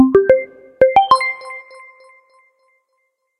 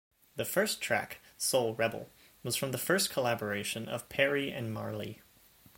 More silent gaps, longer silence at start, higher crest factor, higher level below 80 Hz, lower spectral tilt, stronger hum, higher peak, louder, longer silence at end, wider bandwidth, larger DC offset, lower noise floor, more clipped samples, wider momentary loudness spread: neither; second, 0 s vs 0.35 s; second, 16 dB vs 22 dB; first, -52 dBFS vs -70 dBFS; first, -5.5 dB/octave vs -3 dB/octave; neither; first, 0 dBFS vs -12 dBFS; first, -14 LUFS vs -32 LUFS; first, 1.8 s vs 0.6 s; second, 11 kHz vs 17 kHz; neither; first, -69 dBFS vs -61 dBFS; neither; first, 22 LU vs 15 LU